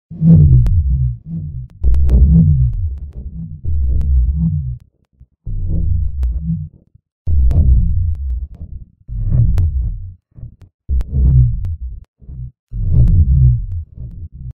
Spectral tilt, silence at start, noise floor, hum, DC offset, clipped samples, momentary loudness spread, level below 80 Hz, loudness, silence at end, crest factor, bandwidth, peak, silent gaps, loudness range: -12 dB/octave; 0.1 s; -49 dBFS; none; under 0.1%; under 0.1%; 21 LU; -18 dBFS; -15 LUFS; 0.05 s; 14 dB; 1.3 kHz; 0 dBFS; 7.12-7.25 s, 10.74-10.79 s, 12.08-12.14 s, 12.59-12.67 s; 5 LU